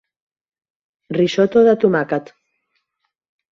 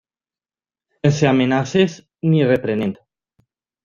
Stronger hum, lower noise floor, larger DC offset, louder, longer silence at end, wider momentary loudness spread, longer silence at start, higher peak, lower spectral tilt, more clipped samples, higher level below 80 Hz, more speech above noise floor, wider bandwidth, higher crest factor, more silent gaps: neither; second, -71 dBFS vs under -90 dBFS; neither; about the same, -16 LUFS vs -18 LUFS; first, 1.3 s vs 0.9 s; first, 11 LU vs 8 LU; about the same, 1.1 s vs 1.05 s; about the same, -2 dBFS vs -2 dBFS; about the same, -6.5 dB/octave vs -6.5 dB/octave; neither; second, -62 dBFS vs -54 dBFS; second, 56 dB vs over 73 dB; about the same, 7.4 kHz vs 7.4 kHz; about the same, 18 dB vs 18 dB; neither